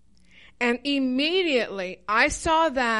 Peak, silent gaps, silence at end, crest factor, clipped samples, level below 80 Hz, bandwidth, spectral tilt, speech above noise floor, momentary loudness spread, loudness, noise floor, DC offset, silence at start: -8 dBFS; none; 0 s; 16 dB; under 0.1%; -48 dBFS; 11.5 kHz; -3 dB/octave; 31 dB; 6 LU; -23 LUFS; -55 dBFS; 0.2%; 0.6 s